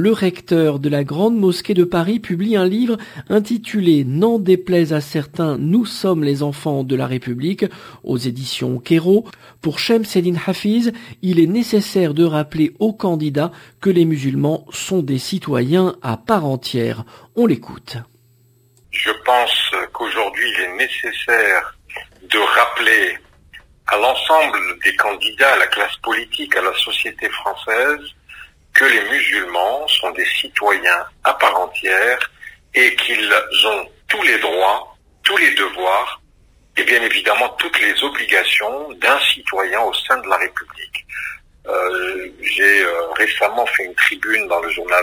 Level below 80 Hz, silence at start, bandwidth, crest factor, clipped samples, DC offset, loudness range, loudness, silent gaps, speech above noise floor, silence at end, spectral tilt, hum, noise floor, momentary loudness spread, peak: -54 dBFS; 0 s; 16 kHz; 18 dB; under 0.1%; under 0.1%; 5 LU; -16 LUFS; none; 37 dB; 0 s; -4.5 dB/octave; none; -54 dBFS; 10 LU; 0 dBFS